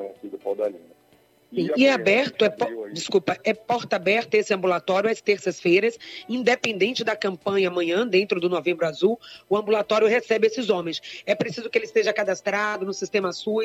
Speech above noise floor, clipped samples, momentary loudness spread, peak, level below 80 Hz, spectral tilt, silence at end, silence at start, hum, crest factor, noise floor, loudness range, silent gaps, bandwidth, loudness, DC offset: 36 dB; under 0.1%; 9 LU; -6 dBFS; -72 dBFS; -4.5 dB/octave; 0 s; 0 s; none; 16 dB; -59 dBFS; 1 LU; none; 12.5 kHz; -23 LUFS; under 0.1%